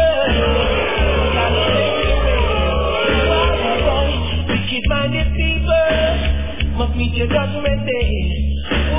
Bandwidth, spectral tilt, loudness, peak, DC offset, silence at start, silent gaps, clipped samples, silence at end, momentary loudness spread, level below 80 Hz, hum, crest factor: 3.8 kHz; -10 dB/octave; -17 LUFS; -4 dBFS; 3%; 0 s; none; under 0.1%; 0 s; 5 LU; -20 dBFS; none; 12 dB